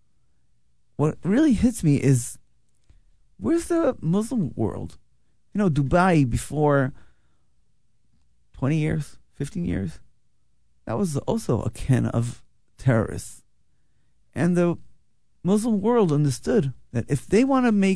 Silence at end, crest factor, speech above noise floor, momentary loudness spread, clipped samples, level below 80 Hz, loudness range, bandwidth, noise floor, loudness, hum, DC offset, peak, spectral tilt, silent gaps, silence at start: 0 s; 18 dB; 48 dB; 14 LU; under 0.1%; -44 dBFS; 6 LU; 11 kHz; -70 dBFS; -23 LUFS; none; 0.7%; -6 dBFS; -7 dB/octave; none; 1 s